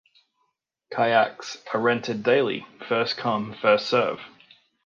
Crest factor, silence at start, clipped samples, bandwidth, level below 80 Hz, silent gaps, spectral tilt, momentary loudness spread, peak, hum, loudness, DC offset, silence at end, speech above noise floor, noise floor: 20 dB; 0.9 s; under 0.1%; 7.4 kHz; -72 dBFS; none; -5 dB/octave; 11 LU; -6 dBFS; none; -24 LUFS; under 0.1%; 0.6 s; 51 dB; -75 dBFS